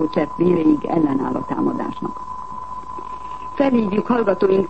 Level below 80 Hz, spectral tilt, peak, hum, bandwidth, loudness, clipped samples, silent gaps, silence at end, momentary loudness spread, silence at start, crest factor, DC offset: -48 dBFS; -8.5 dB/octave; -4 dBFS; none; 8.4 kHz; -19 LUFS; under 0.1%; none; 0 s; 14 LU; 0 s; 16 dB; 1%